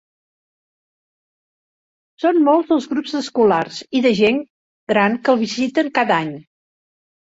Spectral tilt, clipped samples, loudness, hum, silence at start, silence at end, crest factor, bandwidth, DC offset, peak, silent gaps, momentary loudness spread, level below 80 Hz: -5.5 dB/octave; under 0.1%; -17 LUFS; none; 2.2 s; 0.85 s; 16 dB; 8 kHz; under 0.1%; -2 dBFS; 4.50-4.87 s; 8 LU; -62 dBFS